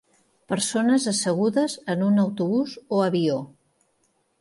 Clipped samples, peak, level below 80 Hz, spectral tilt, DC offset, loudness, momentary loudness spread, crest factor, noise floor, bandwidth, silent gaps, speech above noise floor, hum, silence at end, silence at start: under 0.1%; -10 dBFS; -70 dBFS; -5 dB/octave; under 0.1%; -23 LUFS; 5 LU; 14 dB; -69 dBFS; 11.5 kHz; none; 46 dB; none; 0.95 s; 0.5 s